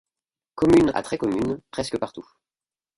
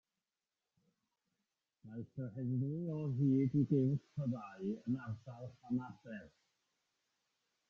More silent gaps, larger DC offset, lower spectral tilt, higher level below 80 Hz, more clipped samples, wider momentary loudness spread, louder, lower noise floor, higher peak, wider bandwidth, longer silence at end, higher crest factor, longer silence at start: neither; neither; second, -6 dB/octave vs -10.5 dB/octave; first, -48 dBFS vs -76 dBFS; neither; second, 13 LU vs 18 LU; first, -23 LUFS vs -38 LUFS; about the same, under -90 dBFS vs under -90 dBFS; first, -6 dBFS vs -22 dBFS; first, 11.5 kHz vs 6.6 kHz; second, 0.75 s vs 1.4 s; about the same, 18 dB vs 18 dB; second, 0.55 s vs 1.85 s